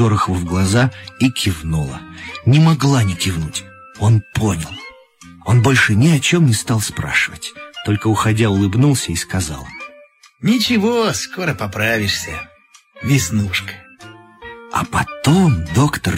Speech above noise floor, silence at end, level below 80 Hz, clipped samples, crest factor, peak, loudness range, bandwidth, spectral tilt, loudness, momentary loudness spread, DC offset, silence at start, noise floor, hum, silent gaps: 30 dB; 0 s; -40 dBFS; under 0.1%; 14 dB; -2 dBFS; 4 LU; 16 kHz; -5 dB/octave; -16 LUFS; 17 LU; under 0.1%; 0 s; -46 dBFS; none; none